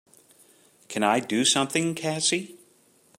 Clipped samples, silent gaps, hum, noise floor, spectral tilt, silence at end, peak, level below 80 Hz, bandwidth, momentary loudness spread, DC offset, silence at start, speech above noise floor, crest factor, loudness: under 0.1%; none; none; -61 dBFS; -2.5 dB/octave; 0.65 s; -8 dBFS; -74 dBFS; 16 kHz; 10 LU; under 0.1%; 0.9 s; 36 dB; 20 dB; -24 LUFS